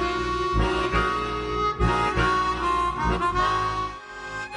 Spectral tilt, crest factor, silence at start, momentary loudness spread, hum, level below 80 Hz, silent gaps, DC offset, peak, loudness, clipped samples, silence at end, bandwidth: -5.5 dB/octave; 14 dB; 0 s; 8 LU; none; -34 dBFS; none; under 0.1%; -10 dBFS; -24 LUFS; under 0.1%; 0 s; 10.5 kHz